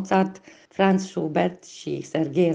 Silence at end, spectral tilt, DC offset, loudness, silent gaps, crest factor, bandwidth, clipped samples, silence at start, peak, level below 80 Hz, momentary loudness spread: 0 s; -6.5 dB/octave; under 0.1%; -24 LUFS; none; 16 dB; 9 kHz; under 0.1%; 0 s; -6 dBFS; -66 dBFS; 11 LU